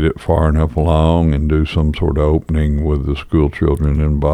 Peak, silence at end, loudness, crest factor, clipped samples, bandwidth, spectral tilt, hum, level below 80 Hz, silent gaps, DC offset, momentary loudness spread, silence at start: -2 dBFS; 0 s; -16 LUFS; 12 dB; under 0.1%; 9 kHz; -9 dB/octave; none; -20 dBFS; none; under 0.1%; 4 LU; 0 s